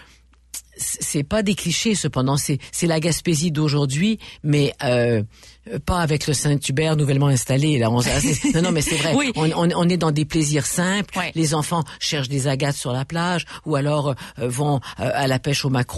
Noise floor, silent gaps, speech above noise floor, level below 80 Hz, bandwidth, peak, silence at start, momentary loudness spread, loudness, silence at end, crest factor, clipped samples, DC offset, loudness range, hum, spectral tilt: -52 dBFS; none; 32 dB; -42 dBFS; 12.5 kHz; -8 dBFS; 0 s; 6 LU; -21 LUFS; 0 s; 12 dB; under 0.1%; under 0.1%; 3 LU; none; -5 dB/octave